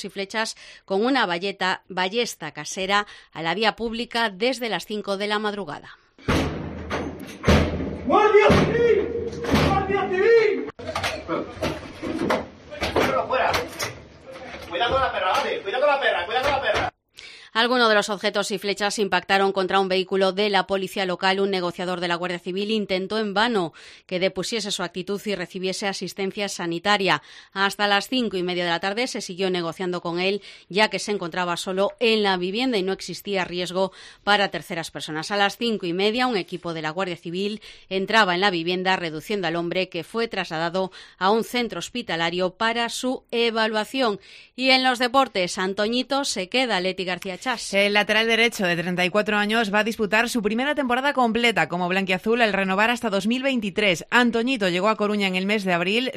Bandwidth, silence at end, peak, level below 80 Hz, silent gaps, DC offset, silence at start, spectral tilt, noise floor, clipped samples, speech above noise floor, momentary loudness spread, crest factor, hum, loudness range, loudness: 15 kHz; 0 s; -4 dBFS; -46 dBFS; none; under 0.1%; 0 s; -4 dB/octave; -46 dBFS; under 0.1%; 23 dB; 10 LU; 20 dB; none; 5 LU; -23 LUFS